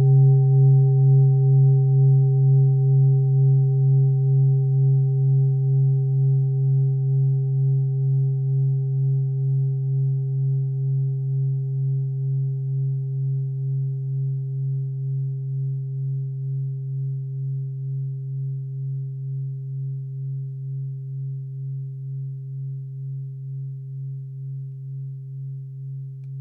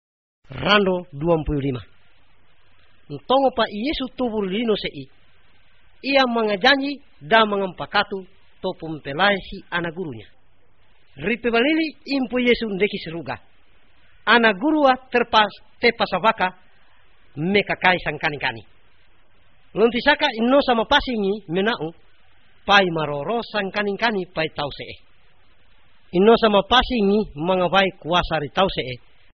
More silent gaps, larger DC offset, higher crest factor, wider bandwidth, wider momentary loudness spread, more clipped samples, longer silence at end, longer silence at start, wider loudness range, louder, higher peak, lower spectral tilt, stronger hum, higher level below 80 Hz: neither; second, under 0.1% vs 0.4%; second, 12 dB vs 20 dB; second, 0.8 kHz vs 6.2 kHz; about the same, 16 LU vs 15 LU; neither; second, 0 s vs 0.35 s; second, 0 s vs 0.5 s; first, 14 LU vs 5 LU; about the same, -22 LUFS vs -20 LUFS; second, -10 dBFS vs -2 dBFS; first, -16 dB/octave vs -2.5 dB/octave; neither; second, -70 dBFS vs -44 dBFS